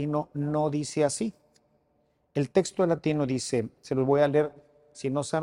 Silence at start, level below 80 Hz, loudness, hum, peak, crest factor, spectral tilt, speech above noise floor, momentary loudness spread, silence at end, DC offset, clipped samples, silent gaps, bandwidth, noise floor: 0 s; -64 dBFS; -28 LUFS; none; -8 dBFS; 18 dB; -6 dB/octave; 43 dB; 9 LU; 0 s; under 0.1%; under 0.1%; none; 11.5 kHz; -70 dBFS